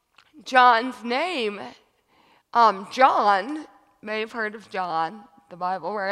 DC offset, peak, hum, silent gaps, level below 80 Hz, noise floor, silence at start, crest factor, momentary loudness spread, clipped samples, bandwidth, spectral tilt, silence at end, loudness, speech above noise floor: under 0.1%; -2 dBFS; none; none; -76 dBFS; -61 dBFS; 0.35 s; 22 dB; 17 LU; under 0.1%; 12 kHz; -3.5 dB/octave; 0 s; -22 LUFS; 39 dB